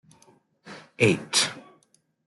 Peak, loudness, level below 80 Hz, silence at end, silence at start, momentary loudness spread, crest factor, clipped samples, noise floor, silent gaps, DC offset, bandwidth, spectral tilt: -6 dBFS; -23 LUFS; -66 dBFS; 0.65 s; 0.65 s; 24 LU; 22 dB; under 0.1%; -66 dBFS; none; under 0.1%; 12.5 kHz; -3 dB/octave